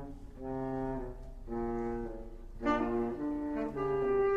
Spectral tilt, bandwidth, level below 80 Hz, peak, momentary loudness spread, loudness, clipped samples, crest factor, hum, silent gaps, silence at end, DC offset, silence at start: -8 dB/octave; 7.6 kHz; -48 dBFS; -18 dBFS; 15 LU; -36 LUFS; under 0.1%; 18 dB; none; none; 0 s; under 0.1%; 0 s